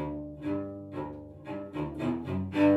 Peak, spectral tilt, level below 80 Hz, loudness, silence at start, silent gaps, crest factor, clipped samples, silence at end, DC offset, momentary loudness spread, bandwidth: -14 dBFS; -8.5 dB/octave; -56 dBFS; -35 LUFS; 0 s; none; 16 dB; under 0.1%; 0 s; under 0.1%; 9 LU; 8 kHz